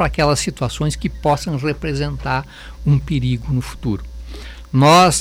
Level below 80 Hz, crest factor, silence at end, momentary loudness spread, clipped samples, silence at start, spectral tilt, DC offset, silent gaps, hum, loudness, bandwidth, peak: -32 dBFS; 12 dB; 0 s; 16 LU; under 0.1%; 0 s; -5 dB/octave; under 0.1%; none; none; -18 LUFS; 16 kHz; -6 dBFS